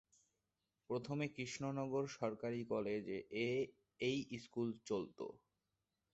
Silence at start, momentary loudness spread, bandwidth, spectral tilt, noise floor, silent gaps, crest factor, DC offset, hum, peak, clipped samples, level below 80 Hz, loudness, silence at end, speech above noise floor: 0.9 s; 6 LU; 8 kHz; -5 dB/octave; -90 dBFS; none; 18 dB; under 0.1%; none; -26 dBFS; under 0.1%; -78 dBFS; -43 LUFS; 0.75 s; 47 dB